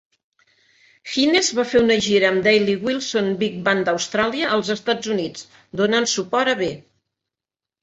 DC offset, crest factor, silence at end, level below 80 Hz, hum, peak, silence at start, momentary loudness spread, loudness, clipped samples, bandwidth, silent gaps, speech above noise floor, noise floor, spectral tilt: under 0.1%; 18 dB; 1 s; -56 dBFS; none; -4 dBFS; 1.05 s; 10 LU; -19 LUFS; under 0.1%; 8.2 kHz; none; 69 dB; -89 dBFS; -3.5 dB/octave